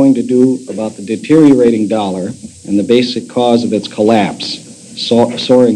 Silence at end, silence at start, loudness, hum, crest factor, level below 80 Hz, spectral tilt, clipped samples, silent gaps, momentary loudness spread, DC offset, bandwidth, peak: 0 s; 0 s; -12 LUFS; none; 12 dB; -54 dBFS; -6 dB/octave; 1%; none; 13 LU; under 0.1%; 11 kHz; 0 dBFS